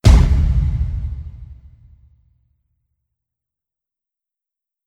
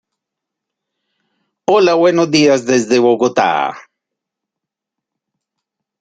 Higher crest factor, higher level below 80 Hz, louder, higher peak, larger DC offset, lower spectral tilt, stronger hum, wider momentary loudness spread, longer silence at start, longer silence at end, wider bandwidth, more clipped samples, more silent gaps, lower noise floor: about the same, 20 dB vs 16 dB; first, -20 dBFS vs -60 dBFS; second, -18 LUFS vs -13 LUFS; about the same, 0 dBFS vs 0 dBFS; neither; first, -6.5 dB/octave vs -4.5 dB/octave; neither; first, 25 LU vs 6 LU; second, 0.05 s vs 1.7 s; first, 3.35 s vs 2.2 s; first, 11 kHz vs 9.2 kHz; neither; neither; first, -87 dBFS vs -82 dBFS